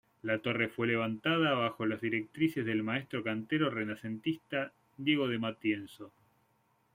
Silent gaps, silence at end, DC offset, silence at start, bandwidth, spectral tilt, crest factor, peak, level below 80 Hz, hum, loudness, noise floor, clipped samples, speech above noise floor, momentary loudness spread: none; 0.85 s; under 0.1%; 0.25 s; 16 kHz; -7 dB/octave; 18 dB; -16 dBFS; -74 dBFS; none; -33 LUFS; -73 dBFS; under 0.1%; 40 dB; 7 LU